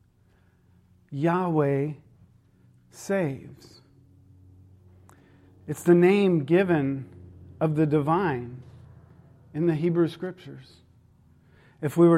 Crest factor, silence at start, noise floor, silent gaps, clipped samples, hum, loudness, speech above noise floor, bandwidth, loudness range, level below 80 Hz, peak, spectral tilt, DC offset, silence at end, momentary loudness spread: 20 dB; 1.1 s; -61 dBFS; none; under 0.1%; none; -25 LUFS; 38 dB; 14 kHz; 12 LU; -66 dBFS; -8 dBFS; -8 dB/octave; under 0.1%; 0 s; 24 LU